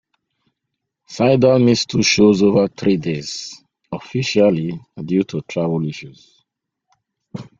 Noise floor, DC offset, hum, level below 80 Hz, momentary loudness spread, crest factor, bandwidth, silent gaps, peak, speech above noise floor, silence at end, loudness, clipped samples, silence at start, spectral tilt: -78 dBFS; under 0.1%; none; -54 dBFS; 19 LU; 18 dB; 7.6 kHz; none; -2 dBFS; 62 dB; 0.15 s; -17 LUFS; under 0.1%; 1.1 s; -5.5 dB/octave